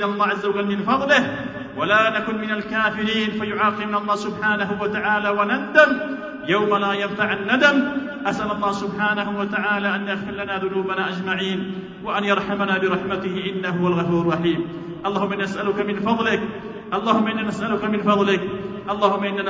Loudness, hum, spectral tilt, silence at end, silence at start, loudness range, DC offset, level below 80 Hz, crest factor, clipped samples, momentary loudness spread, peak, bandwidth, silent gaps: -21 LUFS; none; -6 dB/octave; 0 s; 0 s; 4 LU; under 0.1%; -54 dBFS; 20 dB; under 0.1%; 9 LU; -2 dBFS; 7.8 kHz; none